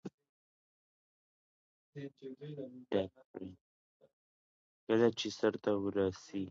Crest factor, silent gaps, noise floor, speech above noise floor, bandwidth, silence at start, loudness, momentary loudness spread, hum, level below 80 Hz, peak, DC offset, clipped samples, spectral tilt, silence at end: 22 dB; 0.14-0.18 s, 0.29-1.93 s, 3.25-3.34 s, 3.61-4.00 s, 4.13-4.87 s; under -90 dBFS; over 54 dB; 7.4 kHz; 0.05 s; -35 LUFS; 19 LU; none; -70 dBFS; -16 dBFS; under 0.1%; under 0.1%; -5 dB/octave; 0 s